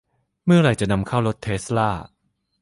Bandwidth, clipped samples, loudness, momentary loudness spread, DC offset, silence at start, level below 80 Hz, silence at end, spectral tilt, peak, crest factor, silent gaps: 11.5 kHz; under 0.1%; -21 LUFS; 11 LU; under 0.1%; 0.45 s; -44 dBFS; 0.55 s; -6.5 dB/octave; -6 dBFS; 16 dB; none